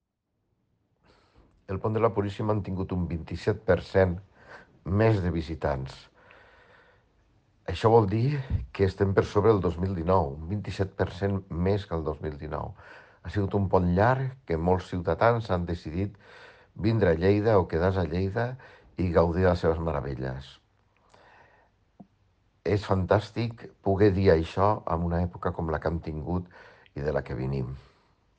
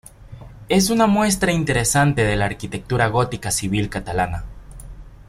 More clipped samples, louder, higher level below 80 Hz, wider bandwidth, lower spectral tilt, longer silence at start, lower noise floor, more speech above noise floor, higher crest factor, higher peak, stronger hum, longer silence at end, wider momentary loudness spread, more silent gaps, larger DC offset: neither; second, -27 LUFS vs -19 LUFS; second, -46 dBFS vs -38 dBFS; second, 8.2 kHz vs 16 kHz; first, -8.5 dB/octave vs -4.5 dB/octave; first, 1.7 s vs 0.2 s; first, -78 dBFS vs -39 dBFS; first, 52 dB vs 20 dB; about the same, 20 dB vs 16 dB; second, -8 dBFS vs -4 dBFS; neither; first, 0.6 s vs 0.05 s; first, 12 LU vs 8 LU; neither; neither